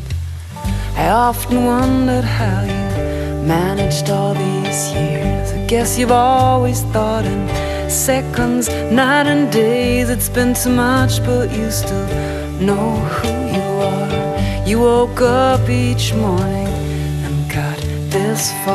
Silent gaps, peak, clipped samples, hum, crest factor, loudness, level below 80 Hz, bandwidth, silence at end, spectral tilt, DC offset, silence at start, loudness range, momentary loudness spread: none; -2 dBFS; under 0.1%; none; 14 dB; -16 LUFS; -28 dBFS; 13 kHz; 0 s; -5 dB/octave; under 0.1%; 0 s; 3 LU; 7 LU